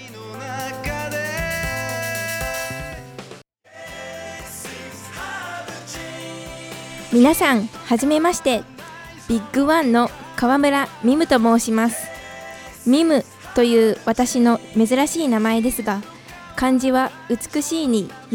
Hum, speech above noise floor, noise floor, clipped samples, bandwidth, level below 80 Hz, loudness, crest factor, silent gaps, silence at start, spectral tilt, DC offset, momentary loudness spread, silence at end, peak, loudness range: none; 25 dB; -43 dBFS; under 0.1%; 19.5 kHz; -44 dBFS; -19 LUFS; 20 dB; none; 0 s; -4 dB/octave; under 0.1%; 18 LU; 0 s; 0 dBFS; 13 LU